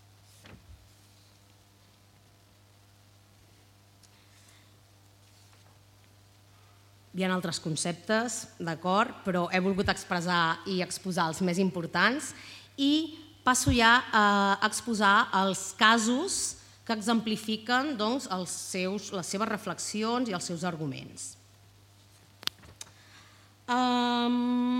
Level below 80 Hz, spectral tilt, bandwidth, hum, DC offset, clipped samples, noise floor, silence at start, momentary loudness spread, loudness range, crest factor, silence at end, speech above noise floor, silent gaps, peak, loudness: -56 dBFS; -3.5 dB/octave; 16.5 kHz; none; under 0.1%; under 0.1%; -60 dBFS; 0.45 s; 14 LU; 12 LU; 24 dB; 0 s; 32 dB; none; -6 dBFS; -28 LUFS